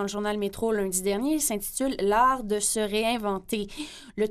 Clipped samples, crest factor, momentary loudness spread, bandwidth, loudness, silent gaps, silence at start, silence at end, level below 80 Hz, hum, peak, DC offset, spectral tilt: under 0.1%; 18 dB; 9 LU; 15.5 kHz; -26 LUFS; none; 0 s; 0 s; -50 dBFS; none; -10 dBFS; under 0.1%; -3 dB/octave